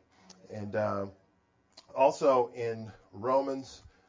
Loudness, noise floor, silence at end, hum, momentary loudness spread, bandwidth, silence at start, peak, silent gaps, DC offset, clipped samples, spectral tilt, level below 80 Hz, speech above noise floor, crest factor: -30 LUFS; -70 dBFS; 0.3 s; none; 17 LU; 7.6 kHz; 0.5 s; -12 dBFS; none; under 0.1%; under 0.1%; -6 dB/octave; -66 dBFS; 40 dB; 20 dB